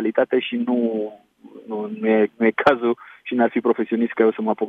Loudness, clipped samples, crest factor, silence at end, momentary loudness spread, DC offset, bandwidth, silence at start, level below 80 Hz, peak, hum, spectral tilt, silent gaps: -21 LUFS; under 0.1%; 18 dB; 0 s; 11 LU; under 0.1%; 5.8 kHz; 0 s; -66 dBFS; -4 dBFS; none; -7.5 dB/octave; none